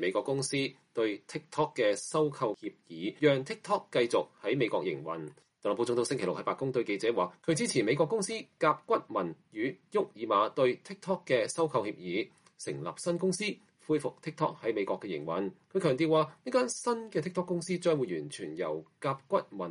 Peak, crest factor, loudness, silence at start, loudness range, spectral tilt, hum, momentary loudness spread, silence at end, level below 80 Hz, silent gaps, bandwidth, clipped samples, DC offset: -12 dBFS; 20 dB; -32 LUFS; 0 s; 3 LU; -5 dB/octave; none; 9 LU; 0 s; -78 dBFS; none; 11.5 kHz; under 0.1%; under 0.1%